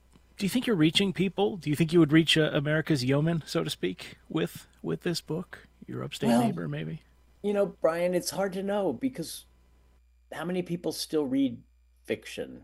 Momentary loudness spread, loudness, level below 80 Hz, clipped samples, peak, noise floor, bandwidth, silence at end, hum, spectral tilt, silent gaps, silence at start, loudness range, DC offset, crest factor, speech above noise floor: 15 LU; -28 LUFS; -60 dBFS; under 0.1%; -8 dBFS; -61 dBFS; 16 kHz; 0.05 s; none; -5.5 dB/octave; none; 0.4 s; 8 LU; under 0.1%; 20 dB; 33 dB